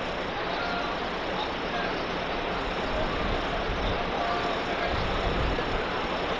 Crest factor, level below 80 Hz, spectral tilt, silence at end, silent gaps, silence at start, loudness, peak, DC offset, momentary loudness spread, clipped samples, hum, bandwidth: 14 dB; -38 dBFS; -5.5 dB/octave; 0 s; none; 0 s; -29 LUFS; -14 dBFS; under 0.1%; 2 LU; under 0.1%; none; 11 kHz